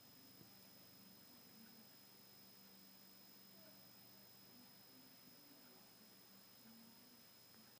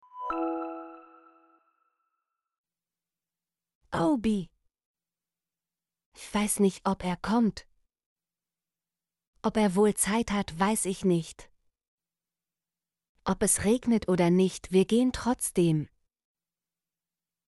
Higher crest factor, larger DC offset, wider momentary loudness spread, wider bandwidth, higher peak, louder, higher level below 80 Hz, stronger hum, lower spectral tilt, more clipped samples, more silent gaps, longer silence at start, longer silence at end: about the same, 16 dB vs 18 dB; neither; second, 2 LU vs 12 LU; first, 15.5 kHz vs 11.5 kHz; second, -48 dBFS vs -12 dBFS; second, -62 LUFS vs -27 LUFS; second, under -90 dBFS vs -54 dBFS; neither; second, -3 dB/octave vs -5 dB/octave; neither; second, none vs 2.58-2.64 s, 3.75-3.81 s, 4.86-4.94 s, 6.06-6.12 s, 8.06-8.16 s, 9.27-9.33 s, 11.88-11.98 s, 13.09-13.15 s; second, 0 s vs 0.15 s; second, 0 s vs 1.6 s